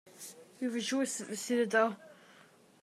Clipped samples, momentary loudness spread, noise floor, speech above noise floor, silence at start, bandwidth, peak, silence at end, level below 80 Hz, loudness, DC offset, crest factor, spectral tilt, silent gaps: under 0.1%; 19 LU; -61 dBFS; 29 dB; 0.15 s; 15 kHz; -14 dBFS; 0.7 s; under -90 dBFS; -33 LUFS; under 0.1%; 20 dB; -3 dB/octave; none